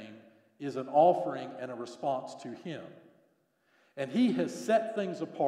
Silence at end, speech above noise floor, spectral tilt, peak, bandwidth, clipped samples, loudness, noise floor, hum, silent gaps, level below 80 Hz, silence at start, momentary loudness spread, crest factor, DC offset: 0 s; 41 dB; -6 dB/octave; -12 dBFS; 12.5 kHz; under 0.1%; -31 LUFS; -72 dBFS; none; none; -90 dBFS; 0 s; 18 LU; 20 dB; under 0.1%